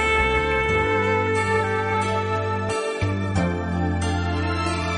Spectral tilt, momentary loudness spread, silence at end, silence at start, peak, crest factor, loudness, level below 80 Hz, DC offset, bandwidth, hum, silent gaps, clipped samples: -5.5 dB/octave; 5 LU; 0 s; 0 s; -6 dBFS; 16 dB; -22 LUFS; -36 dBFS; under 0.1%; 10.5 kHz; none; none; under 0.1%